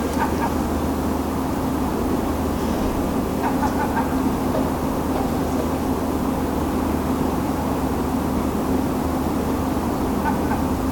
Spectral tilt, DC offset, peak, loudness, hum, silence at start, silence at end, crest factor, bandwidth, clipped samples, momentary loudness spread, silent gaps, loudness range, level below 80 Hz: -6.5 dB/octave; 0.3%; -8 dBFS; -22 LUFS; none; 0 s; 0 s; 12 dB; 18 kHz; under 0.1%; 1 LU; none; 0 LU; -34 dBFS